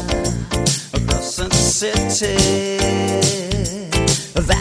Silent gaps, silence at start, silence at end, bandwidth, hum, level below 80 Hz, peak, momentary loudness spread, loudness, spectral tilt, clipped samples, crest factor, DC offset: none; 0 s; 0 s; 11 kHz; none; -28 dBFS; 0 dBFS; 5 LU; -18 LUFS; -3.5 dB/octave; under 0.1%; 18 dB; under 0.1%